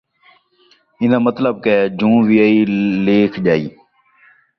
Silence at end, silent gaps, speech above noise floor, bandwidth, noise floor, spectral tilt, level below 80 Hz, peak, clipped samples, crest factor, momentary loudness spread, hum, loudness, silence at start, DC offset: 0.9 s; none; 41 dB; 6 kHz; -55 dBFS; -9 dB/octave; -54 dBFS; -2 dBFS; under 0.1%; 14 dB; 6 LU; none; -15 LUFS; 1 s; under 0.1%